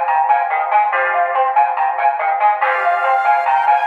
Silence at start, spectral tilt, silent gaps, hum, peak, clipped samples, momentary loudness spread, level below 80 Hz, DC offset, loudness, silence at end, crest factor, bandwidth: 0 s; 0 dB/octave; none; none; -2 dBFS; under 0.1%; 2 LU; under -90 dBFS; under 0.1%; -15 LUFS; 0 s; 12 dB; 4.9 kHz